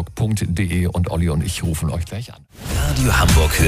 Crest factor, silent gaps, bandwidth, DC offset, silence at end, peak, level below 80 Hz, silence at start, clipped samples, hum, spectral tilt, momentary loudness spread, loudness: 16 dB; none; 15.5 kHz; under 0.1%; 0 s; -2 dBFS; -24 dBFS; 0 s; under 0.1%; none; -5 dB/octave; 14 LU; -19 LUFS